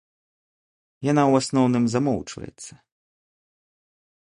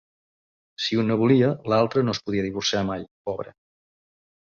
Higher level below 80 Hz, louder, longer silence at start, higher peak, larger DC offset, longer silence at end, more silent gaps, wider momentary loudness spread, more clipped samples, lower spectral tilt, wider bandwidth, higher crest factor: about the same, -58 dBFS vs -56 dBFS; about the same, -21 LUFS vs -23 LUFS; first, 1 s vs 0.8 s; about the same, -6 dBFS vs -8 dBFS; neither; first, 1.65 s vs 1 s; second, none vs 3.11-3.25 s; first, 20 LU vs 13 LU; neither; about the same, -6 dB/octave vs -5.5 dB/octave; first, 11 kHz vs 7.4 kHz; about the same, 20 dB vs 18 dB